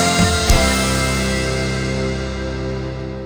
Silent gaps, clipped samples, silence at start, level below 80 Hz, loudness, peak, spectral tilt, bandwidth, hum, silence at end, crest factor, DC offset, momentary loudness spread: none; under 0.1%; 0 s; -24 dBFS; -18 LUFS; 0 dBFS; -4 dB/octave; over 20 kHz; none; 0 s; 18 dB; under 0.1%; 10 LU